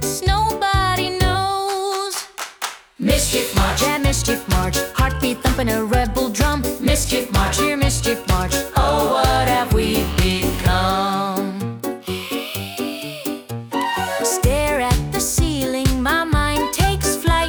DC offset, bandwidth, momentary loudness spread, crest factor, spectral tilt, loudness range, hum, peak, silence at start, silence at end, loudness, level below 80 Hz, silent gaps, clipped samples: under 0.1%; over 20 kHz; 9 LU; 16 dB; -4 dB/octave; 4 LU; none; -4 dBFS; 0 s; 0 s; -19 LUFS; -26 dBFS; none; under 0.1%